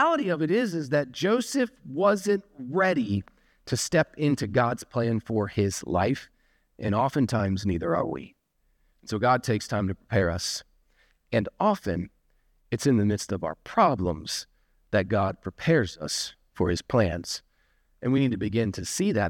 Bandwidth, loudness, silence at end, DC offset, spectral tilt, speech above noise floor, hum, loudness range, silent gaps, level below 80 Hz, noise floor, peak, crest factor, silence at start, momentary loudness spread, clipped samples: 18 kHz; -27 LUFS; 0 s; under 0.1%; -5.5 dB/octave; 43 dB; none; 3 LU; none; -52 dBFS; -69 dBFS; -8 dBFS; 18 dB; 0 s; 9 LU; under 0.1%